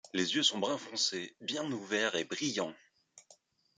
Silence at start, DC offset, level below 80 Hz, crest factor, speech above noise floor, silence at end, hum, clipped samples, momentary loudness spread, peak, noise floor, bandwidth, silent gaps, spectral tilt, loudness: 0.05 s; under 0.1%; -82 dBFS; 20 dB; 31 dB; 0.45 s; none; under 0.1%; 9 LU; -16 dBFS; -66 dBFS; 9.6 kHz; none; -2 dB/octave; -33 LUFS